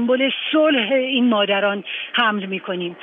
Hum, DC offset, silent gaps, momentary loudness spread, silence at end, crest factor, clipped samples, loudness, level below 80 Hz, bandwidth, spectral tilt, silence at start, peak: none; under 0.1%; none; 9 LU; 0 s; 16 dB; under 0.1%; -19 LUFS; -74 dBFS; 3.9 kHz; -8 dB/octave; 0 s; -4 dBFS